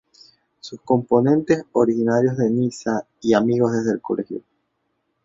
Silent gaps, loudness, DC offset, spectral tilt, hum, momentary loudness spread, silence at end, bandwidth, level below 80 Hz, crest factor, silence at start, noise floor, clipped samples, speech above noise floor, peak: none; -20 LUFS; under 0.1%; -7 dB/octave; none; 15 LU; 0.85 s; 7.8 kHz; -60 dBFS; 18 dB; 0.65 s; -72 dBFS; under 0.1%; 53 dB; -2 dBFS